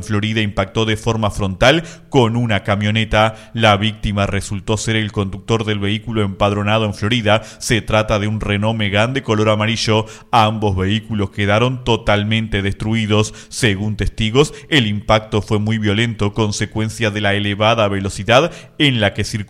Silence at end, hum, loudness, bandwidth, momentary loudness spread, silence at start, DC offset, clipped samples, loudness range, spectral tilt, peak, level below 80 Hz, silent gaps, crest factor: 0.05 s; none; -17 LUFS; 13 kHz; 6 LU; 0 s; under 0.1%; under 0.1%; 2 LU; -5 dB/octave; 0 dBFS; -34 dBFS; none; 16 dB